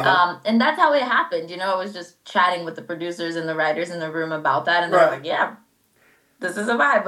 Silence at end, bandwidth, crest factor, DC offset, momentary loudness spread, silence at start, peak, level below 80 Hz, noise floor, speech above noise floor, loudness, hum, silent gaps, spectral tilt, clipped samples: 0 s; 13.5 kHz; 20 dB; under 0.1%; 12 LU; 0 s; -2 dBFS; -78 dBFS; -60 dBFS; 39 dB; -21 LUFS; none; none; -4.5 dB/octave; under 0.1%